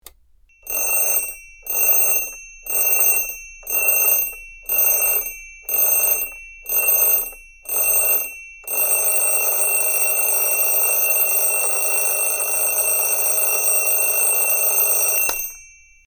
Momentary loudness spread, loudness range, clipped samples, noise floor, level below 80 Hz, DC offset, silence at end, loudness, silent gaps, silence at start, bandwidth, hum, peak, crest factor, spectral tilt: 12 LU; 2 LU; under 0.1%; -54 dBFS; -50 dBFS; under 0.1%; 0.45 s; -16 LUFS; none; 0.65 s; 19 kHz; none; -4 dBFS; 16 dB; 2 dB/octave